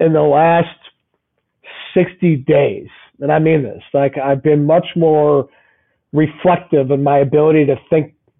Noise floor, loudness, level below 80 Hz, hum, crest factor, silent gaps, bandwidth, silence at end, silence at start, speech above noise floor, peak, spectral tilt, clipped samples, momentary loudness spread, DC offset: -69 dBFS; -14 LUFS; -54 dBFS; none; 10 dB; none; 3.9 kHz; 0.35 s; 0 s; 56 dB; -4 dBFS; -7 dB/octave; under 0.1%; 8 LU; under 0.1%